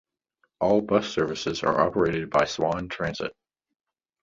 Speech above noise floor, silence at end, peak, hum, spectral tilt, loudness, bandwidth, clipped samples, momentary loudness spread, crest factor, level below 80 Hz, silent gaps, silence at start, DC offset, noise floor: 47 dB; 0.9 s; -8 dBFS; none; -5.5 dB/octave; -25 LUFS; 7.8 kHz; under 0.1%; 8 LU; 20 dB; -54 dBFS; none; 0.6 s; under 0.1%; -72 dBFS